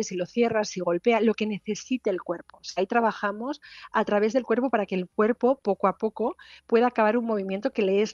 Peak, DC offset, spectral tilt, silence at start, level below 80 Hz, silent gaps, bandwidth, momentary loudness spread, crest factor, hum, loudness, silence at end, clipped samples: -8 dBFS; under 0.1%; -5.5 dB/octave; 0 s; -68 dBFS; none; 7.4 kHz; 9 LU; 18 dB; none; -26 LUFS; 0 s; under 0.1%